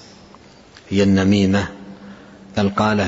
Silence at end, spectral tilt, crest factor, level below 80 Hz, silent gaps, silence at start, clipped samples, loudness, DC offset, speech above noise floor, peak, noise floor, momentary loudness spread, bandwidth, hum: 0 s; -6.5 dB/octave; 16 dB; -48 dBFS; none; 0.9 s; under 0.1%; -18 LUFS; under 0.1%; 29 dB; -4 dBFS; -45 dBFS; 23 LU; 8 kHz; none